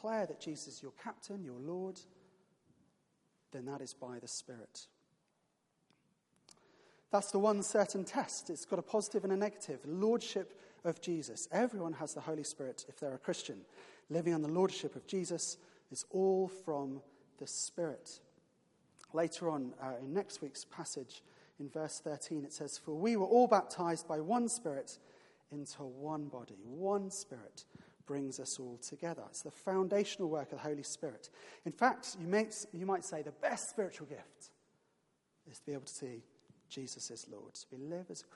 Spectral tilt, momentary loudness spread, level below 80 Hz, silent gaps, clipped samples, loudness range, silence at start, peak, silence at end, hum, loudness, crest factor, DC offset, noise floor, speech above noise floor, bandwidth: -4.5 dB/octave; 17 LU; -88 dBFS; none; under 0.1%; 14 LU; 0 s; -14 dBFS; 0 s; none; -39 LUFS; 24 dB; under 0.1%; -80 dBFS; 42 dB; 11.5 kHz